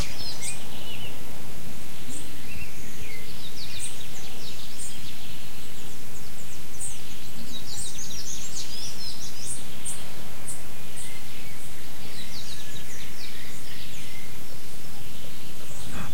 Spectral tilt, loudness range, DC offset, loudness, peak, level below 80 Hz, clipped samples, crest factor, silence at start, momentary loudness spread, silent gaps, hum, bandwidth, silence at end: -3 dB/octave; 4 LU; 20%; -37 LUFS; -12 dBFS; -52 dBFS; under 0.1%; 24 dB; 0 s; 7 LU; none; none; 16.5 kHz; 0 s